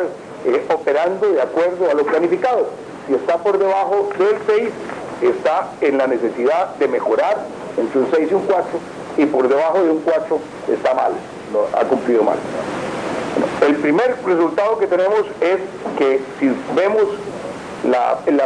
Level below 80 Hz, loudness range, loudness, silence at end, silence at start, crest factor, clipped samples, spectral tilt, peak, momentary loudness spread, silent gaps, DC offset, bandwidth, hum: -60 dBFS; 1 LU; -18 LUFS; 0 s; 0 s; 16 dB; under 0.1%; -6 dB/octave; 0 dBFS; 8 LU; none; under 0.1%; 10.5 kHz; none